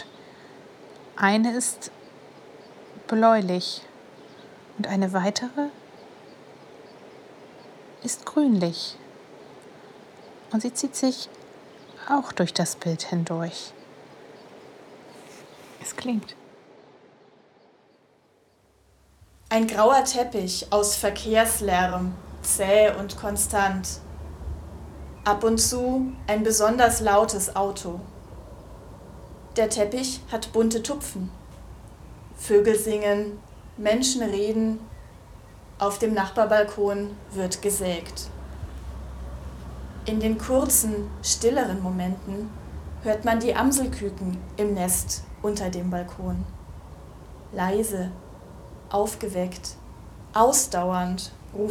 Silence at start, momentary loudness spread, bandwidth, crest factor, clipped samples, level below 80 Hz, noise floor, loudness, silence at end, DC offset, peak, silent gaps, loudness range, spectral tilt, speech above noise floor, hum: 0 s; 24 LU; 19.5 kHz; 24 dB; under 0.1%; -44 dBFS; -61 dBFS; -24 LUFS; 0 s; under 0.1%; -2 dBFS; none; 9 LU; -4 dB/octave; 38 dB; none